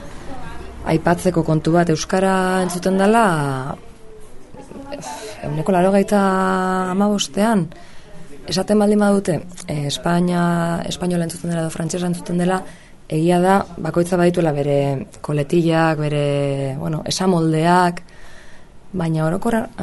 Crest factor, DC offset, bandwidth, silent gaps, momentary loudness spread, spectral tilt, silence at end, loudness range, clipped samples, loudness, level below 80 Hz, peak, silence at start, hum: 18 dB; under 0.1%; 12 kHz; none; 15 LU; -6 dB/octave; 0 s; 3 LU; under 0.1%; -18 LUFS; -42 dBFS; -2 dBFS; 0 s; none